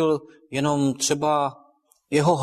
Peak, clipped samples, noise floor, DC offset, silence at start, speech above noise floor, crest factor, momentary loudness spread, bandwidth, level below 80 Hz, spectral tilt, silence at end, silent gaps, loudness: -6 dBFS; under 0.1%; -60 dBFS; under 0.1%; 0 s; 38 dB; 16 dB; 8 LU; 14 kHz; -62 dBFS; -4.5 dB/octave; 0 s; none; -23 LUFS